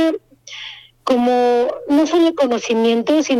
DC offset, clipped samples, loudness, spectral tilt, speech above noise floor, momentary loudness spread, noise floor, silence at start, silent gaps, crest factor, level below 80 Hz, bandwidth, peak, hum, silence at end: under 0.1%; under 0.1%; -16 LUFS; -4 dB/octave; 21 dB; 16 LU; -36 dBFS; 0 s; none; 14 dB; -58 dBFS; 13 kHz; -4 dBFS; none; 0 s